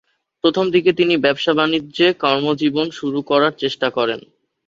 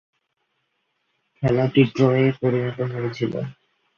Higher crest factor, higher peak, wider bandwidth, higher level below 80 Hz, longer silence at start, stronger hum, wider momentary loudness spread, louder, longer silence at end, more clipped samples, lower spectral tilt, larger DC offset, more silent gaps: about the same, 16 dB vs 20 dB; about the same, -2 dBFS vs -4 dBFS; about the same, 7.4 kHz vs 7 kHz; about the same, -60 dBFS vs -56 dBFS; second, 0.45 s vs 1.4 s; neither; second, 6 LU vs 9 LU; first, -17 LUFS vs -21 LUFS; about the same, 0.45 s vs 0.45 s; neither; second, -5.5 dB/octave vs -8.5 dB/octave; neither; neither